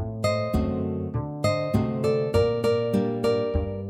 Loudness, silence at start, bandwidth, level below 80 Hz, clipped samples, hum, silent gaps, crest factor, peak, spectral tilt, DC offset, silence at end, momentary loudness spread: -25 LUFS; 0 s; 15.5 kHz; -38 dBFS; under 0.1%; none; none; 16 dB; -8 dBFS; -7 dB/octave; under 0.1%; 0 s; 5 LU